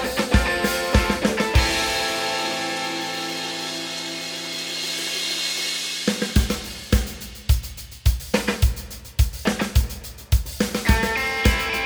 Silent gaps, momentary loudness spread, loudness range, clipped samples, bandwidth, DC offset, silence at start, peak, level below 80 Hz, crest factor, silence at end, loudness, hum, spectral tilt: none; 7 LU; 3 LU; under 0.1%; over 20 kHz; under 0.1%; 0 s; -2 dBFS; -26 dBFS; 22 dB; 0 s; -23 LUFS; none; -4 dB/octave